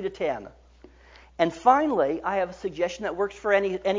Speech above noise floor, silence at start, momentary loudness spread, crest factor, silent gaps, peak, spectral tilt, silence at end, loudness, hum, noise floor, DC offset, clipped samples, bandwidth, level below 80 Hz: 27 dB; 0 s; 10 LU; 20 dB; none; -6 dBFS; -5.5 dB/octave; 0 s; -25 LUFS; none; -52 dBFS; under 0.1%; under 0.1%; 7.6 kHz; -56 dBFS